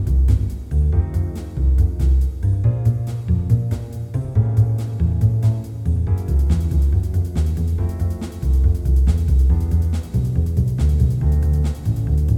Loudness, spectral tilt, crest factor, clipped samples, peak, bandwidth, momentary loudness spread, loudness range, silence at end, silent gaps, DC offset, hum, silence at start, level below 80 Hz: -20 LUFS; -9 dB/octave; 12 dB; under 0.1%; -6 dBFS; 10.5 kHz; 6 LU; 2 LU; 0 s; none; under 0.1%; none; 0 s; -20 dBFS